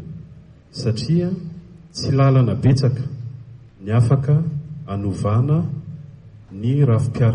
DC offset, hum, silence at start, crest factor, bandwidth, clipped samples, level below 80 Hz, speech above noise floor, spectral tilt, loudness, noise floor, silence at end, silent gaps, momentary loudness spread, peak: under 0.1%; none; 0 s; 14 dB; 10 kHz; under 0.1%; -46 dBFS; 26 dB; -8 dB/octave; -19 LUFS; -43 dBFS; 0 s; none; 20 LU; -6 dBFS